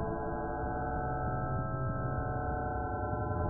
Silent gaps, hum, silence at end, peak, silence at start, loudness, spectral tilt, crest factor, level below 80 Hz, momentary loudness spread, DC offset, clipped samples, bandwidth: none; none; 0 s; -22 dBFS; 0 s; -35 LUFS; -12 dB/octave; 12 dB; -42 dBFS; 1 LU; under 0.1%; under 0.1%; 1.8 kHz